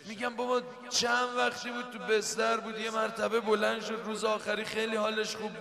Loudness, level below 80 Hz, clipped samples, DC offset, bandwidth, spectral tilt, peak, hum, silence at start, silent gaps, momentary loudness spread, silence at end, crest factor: -31 LUFS; -72 dBFS; under 0.1%; under 0.1%; 14.5 kHz; -2.5 dB/octave; -14 dBFS; none; 0 s; none; 7 LU; 0 s; 16 dB